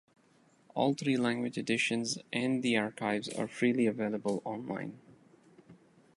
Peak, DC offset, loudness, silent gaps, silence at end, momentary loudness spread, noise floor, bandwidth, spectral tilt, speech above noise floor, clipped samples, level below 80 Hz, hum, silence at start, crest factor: -14 dBFS; under 0.1%; -32 LUFS; none; 0.45 s; 9 LU; -66 dBFS; 11.5 kHz; -4.5 dB/octave; 34 dB; under 0.1%; -76 dBFS; none; 0.75 s; 20 dB